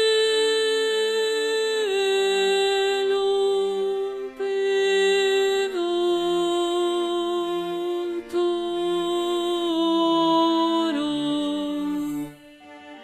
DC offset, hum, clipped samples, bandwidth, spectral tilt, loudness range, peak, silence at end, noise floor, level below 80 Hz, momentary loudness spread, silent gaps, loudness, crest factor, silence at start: under 0.1%; none; under 0.1%; 13.5 kHz; -3 dB/octave; 3 LU; -10 dBFS; 0 s; -45 dBFS; -60 dBFS; 8 LU; none; -23 LUFS; 12 dB; 0 s